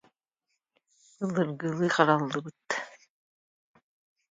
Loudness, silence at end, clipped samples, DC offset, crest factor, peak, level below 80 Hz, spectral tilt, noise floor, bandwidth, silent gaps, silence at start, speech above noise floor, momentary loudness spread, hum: -28 LUFS; 1.35 s; under 0.1%; under 0.1%; 24 dB; -6 dBFS; -78 dBFS; -5.5 dB/octave; -82 dBFS; 9.2 kHz; none; 1.2 s; 55 dB; 13 LU; none